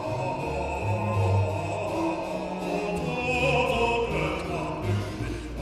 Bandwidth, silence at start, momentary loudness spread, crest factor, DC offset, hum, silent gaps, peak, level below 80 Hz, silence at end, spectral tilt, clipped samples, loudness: 13.5 kHz; 0 s; 8 LU; 14 dB; under 0.1%; none; none; -12 dBFS; -42 dBFS; 0 s; -6 dB/octave; under 0.1%; -27 LUFS